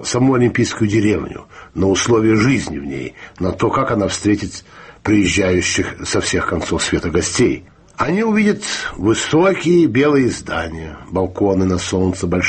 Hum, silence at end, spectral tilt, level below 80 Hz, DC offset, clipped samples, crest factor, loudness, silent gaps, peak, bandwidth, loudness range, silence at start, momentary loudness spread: none; 0 s; -5 dB/octave; -40 dBFS; under 0.1%; under 0.1%; 14 dB; -16 LUFS; none; -4 dBFS; 8.8 kHz; 2 LU; 0 s; 12 LU